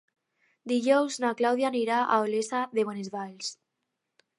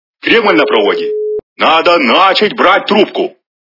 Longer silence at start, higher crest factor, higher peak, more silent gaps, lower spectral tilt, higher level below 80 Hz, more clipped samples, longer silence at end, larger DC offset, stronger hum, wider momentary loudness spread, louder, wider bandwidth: first, 0.65 s vs 0.25 s; first, 18 dB vs 10 dB; second, -10 dBFS vs 0 dBFS; second, none vs 1.43-1.56 s; about the same, -4 dB/octave vs -5 dB/octave; second, -84 dBFS vs -54 dBFS; second, under 0.1% vs 0.5%; first, 0.85 s vs 0.35 s; neither; neither; about the same, 12 LU vs 10 LU; second, -28 LUFS vs -10 LUFS; first, 11.5 kHz vs 6 kHz